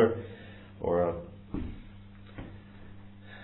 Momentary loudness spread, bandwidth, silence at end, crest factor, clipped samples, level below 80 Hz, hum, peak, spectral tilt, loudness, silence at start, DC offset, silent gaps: 22 LU; 4 kHz; 0 s; 22 dB; under 0.1%; -50 dBFS; none; -12 dBFS; -7 dB/octave; -33 LUFS; 0 s; under 0.1%; none